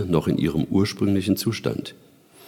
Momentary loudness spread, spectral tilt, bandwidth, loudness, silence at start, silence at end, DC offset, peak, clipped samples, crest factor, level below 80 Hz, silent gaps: 8 LU; -6.5 dB/octave; 18.5 kHz; -23 LUFS; 0 s; 0 s; under 0.1%; -6 dBFS; under 0.1%; 18 dB; -48 dBFS; none